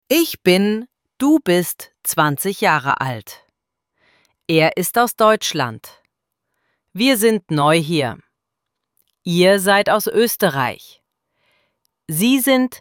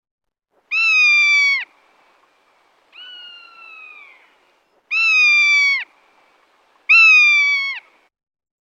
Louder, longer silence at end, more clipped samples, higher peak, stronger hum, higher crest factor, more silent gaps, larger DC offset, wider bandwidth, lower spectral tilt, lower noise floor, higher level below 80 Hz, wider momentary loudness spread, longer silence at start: second, -17 LUFS vs -12 LUFS; second, 0.05 s vs 0.8 s; neither; about the same, -2 dBFS vs -4 dBFS; neither; about the same, 16 dB vs 14 dB; neither; neither; first, 18 kHz vs 8.6 kHz; first, -4.5 dB/octave vs 6 dB/octave; first, -79 dBFS vs -65 dBFS; first, -62 dBFS vs -88 dBFS; second, 11 LU vs 25 LU; second, 0.1 s vs 0.7 s